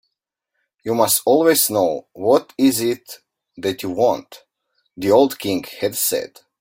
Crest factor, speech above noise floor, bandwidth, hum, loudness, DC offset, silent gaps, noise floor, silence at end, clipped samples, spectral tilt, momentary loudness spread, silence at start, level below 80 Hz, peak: 18 dB; 61 dB; 16.5 kHz; none; -18 LUFS; under 0.1%; none; -79 dBFS; 0.35 s; under 0.1%; -3.5 dB/octave; 12 LU; 0.85 s; -62 dBFS; 0 dBFS